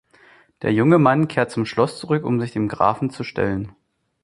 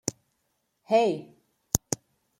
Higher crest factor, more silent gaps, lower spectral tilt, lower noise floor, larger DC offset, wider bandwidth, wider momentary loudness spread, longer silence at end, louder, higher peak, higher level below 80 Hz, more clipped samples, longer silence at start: second, 20 dB vs 30 dB; neither; first, -7.5 dB/octave vs -3.5 dB/octave; second, -52 dBFS vs -76 dBFS; neither; second, 11.5 kHz vs 16.5 kHz; about the same, 11 LU vs 11 LU; about the same, 0.55 s vs 0.45 s; first, -20 LUFS vs -28 LUFS; about the same, -2 dBFS vs 0 dBFS; about the same, -50 dBFS vs -52 dBFS; neither; first, 0.6 s vs 0.05 s